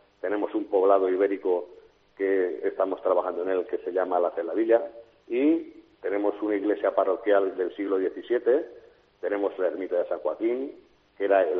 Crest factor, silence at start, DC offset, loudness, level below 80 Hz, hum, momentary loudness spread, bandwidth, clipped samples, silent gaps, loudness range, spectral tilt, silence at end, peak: 18 dB; 0.25 s; under 0.1%; -26 LUFS; -72 dBFS; none; 8 LU; 4.4 kHz; under 0.1%; none; 2 LU; -3 dB/octave; 0 s; -8 dBFS